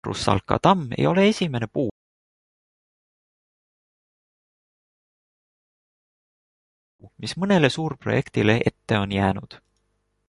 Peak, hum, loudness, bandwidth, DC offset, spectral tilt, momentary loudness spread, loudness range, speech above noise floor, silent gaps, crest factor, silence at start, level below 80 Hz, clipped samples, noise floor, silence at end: -2 dBFS; none; -22 LUFS; 11.5 kHz; under 0.1%; -6 dB/octave; 9 LU; 12 LU; 50 dB; 1.91-6.99 s; 24 dB; 0.05 s; -50 dBFS; under 0.1%; -72 dBFS; 0.7 s